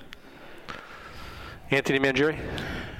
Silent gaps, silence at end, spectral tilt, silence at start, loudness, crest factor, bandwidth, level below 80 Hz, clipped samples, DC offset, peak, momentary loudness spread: none; 0 s; -5 dB/octave; 0 s; -25 LUFS; 24 dB; 16 kHz; -48 dBFS; under 0.1%; under 0.1%; -6 dBFS; 23 LU